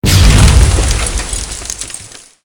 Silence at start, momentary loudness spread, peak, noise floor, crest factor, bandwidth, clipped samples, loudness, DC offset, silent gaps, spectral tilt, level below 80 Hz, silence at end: 0.05 s; 15 LU; 0 dBFS; -32 dBFS; 10 dB; 19 kHz; 0.9%; -11 LUFS; under 0.1%; none; -4 dB/octave; -14 dBFS; 0.4 s